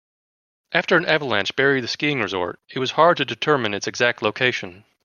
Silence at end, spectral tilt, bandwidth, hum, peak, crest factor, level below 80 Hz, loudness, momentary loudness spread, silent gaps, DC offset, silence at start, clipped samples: 0.25 s; -4 dB/octave; 7.2 kHz; none; -2 dBFS; 20 dB; -66 dBFS; -20 LUFS; 9 LU; none; under 0.1%; 0.7 s; under 0.1%